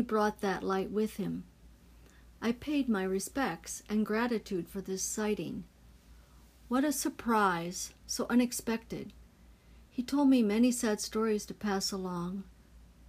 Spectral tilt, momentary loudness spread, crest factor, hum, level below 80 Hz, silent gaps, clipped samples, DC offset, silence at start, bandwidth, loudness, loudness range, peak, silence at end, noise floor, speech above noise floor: -4.5 dB/octave; 12 LU; 18 dB; none; -58 dBFS; none; under 0.1%; under 0.1%; 0 s; 15.5 kHz; -32 LUFS; 4 LU; -16 dBFS; 0.25 s; -58 dBFS; 26 dB